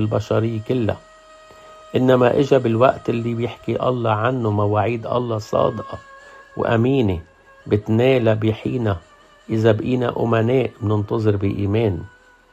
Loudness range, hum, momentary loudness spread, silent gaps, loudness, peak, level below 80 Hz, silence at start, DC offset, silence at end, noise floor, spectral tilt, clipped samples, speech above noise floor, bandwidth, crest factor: 3 LU; none; 9 LU; none; -19 LUFS; -2 dBFS; -52 dBFS; 0 s; under 0.1%; 0.45 s; -45 dBFS; -8 dB/octave; under 0.1%; 27 dB; 8 kHz; 18 dB